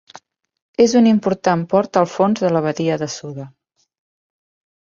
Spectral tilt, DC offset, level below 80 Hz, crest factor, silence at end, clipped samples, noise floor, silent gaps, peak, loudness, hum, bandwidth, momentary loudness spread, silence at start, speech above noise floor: -6 dB/octave; under 0.1%; -60 dBFS; 16 dB; 1.4 s; under 0.1%; -46 dBFS; none; -2 dBFS; -17 LUFS; none; 7.6 kHz; 17 LU; 0.8 s; 30 dB